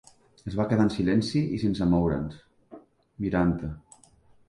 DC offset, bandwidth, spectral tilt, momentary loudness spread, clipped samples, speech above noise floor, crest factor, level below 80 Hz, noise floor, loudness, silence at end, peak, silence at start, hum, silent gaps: under 0.1%; 11.5 kHz; -7.5 dB/octave; 14 LU; under 0.1%; 33 dB; 16 dB; -46 dBFS; -58 dBFS; -26 LUFS; 0.7 s; -10 dBFS; 0.45 s; none; none